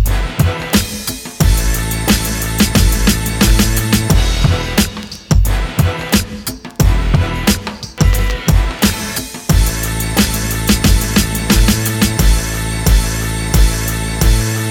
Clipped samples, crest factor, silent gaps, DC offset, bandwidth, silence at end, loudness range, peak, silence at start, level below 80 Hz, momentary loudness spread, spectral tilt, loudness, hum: under 0.1%; 14 dB; none; under 0.1%; 20 kHz; 0 s; 2 LU; 0 dBFS; 0 s; -16 dBFS; 6 LU; -4.5 dB/octave; -14 LUFS; none